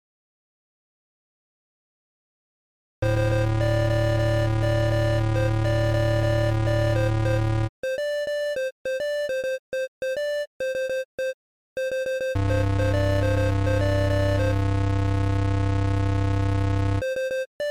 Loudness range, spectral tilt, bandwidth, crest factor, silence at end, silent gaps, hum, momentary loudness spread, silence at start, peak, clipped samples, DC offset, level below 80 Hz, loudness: 6 LU; -7 dB/octave; 13.5 kHz; 8 dB; 0 s; 7.69-7.83 s, 8.72-8.85 s, 9.59-9.72 s, 9.88-10.01 s, 10.47-10.60 s, 11.05-11.18 s, 11.34-11.76 s, 17.46-17.59 s; none; 6 LU; 3 s; -16 dBFS; under 0.1%; under 0.1%; -34 dBFS; -24 LUFS